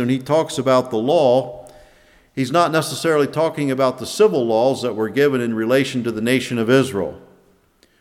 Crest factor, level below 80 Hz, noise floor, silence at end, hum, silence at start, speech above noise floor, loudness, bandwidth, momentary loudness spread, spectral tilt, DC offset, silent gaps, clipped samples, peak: 18 dB; -58 dBFS; -57 dBFS; 0.8 s; none; 0 s; 39 dB; -18 LUFS; 16 kHz; 6 LU; -5.5 dB/octave; under 0.1%; none; under 0.1%; -2 dBFS